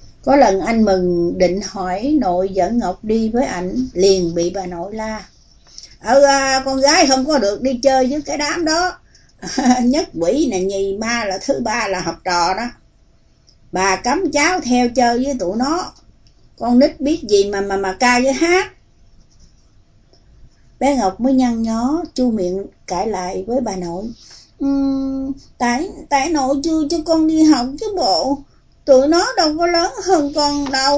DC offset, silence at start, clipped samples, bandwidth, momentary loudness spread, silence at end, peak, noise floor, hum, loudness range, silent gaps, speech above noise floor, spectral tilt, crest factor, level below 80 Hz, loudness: under 0.1%; 0 s; under 0.1%; 8 kHz; 11 LU; 0 s; 0 dBFS; -52 dBFS; none; 5 LU; none; 35 dB; -4 dB/octave; 16 dB; -42 dBFS; -17 LUFS